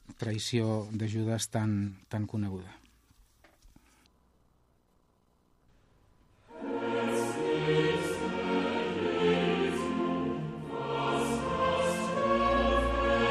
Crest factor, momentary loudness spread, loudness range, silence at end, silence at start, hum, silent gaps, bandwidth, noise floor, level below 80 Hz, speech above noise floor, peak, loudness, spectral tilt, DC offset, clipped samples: 18 dB; 9 LU; 13 LU; 0 s; 0.1 s; none; none; 14 kHz; -69 dBFS; -48 dBFS; 36 dB; -14 dBFS; -30 LUFS; -5.5 dB/octave; under 0.1%; under 0.1%